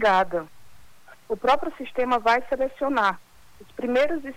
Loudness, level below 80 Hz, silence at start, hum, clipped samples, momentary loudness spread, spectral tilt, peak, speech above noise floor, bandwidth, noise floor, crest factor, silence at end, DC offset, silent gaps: -24 LUFS; -52 dBFS; 0 s; none; under 0.1%; 12 LU; -4.5 dB/octave; -10 dBFS; 30 dB; 18 kHz; -53 dBFS; 16 dB; 0 s; under 0.1%; none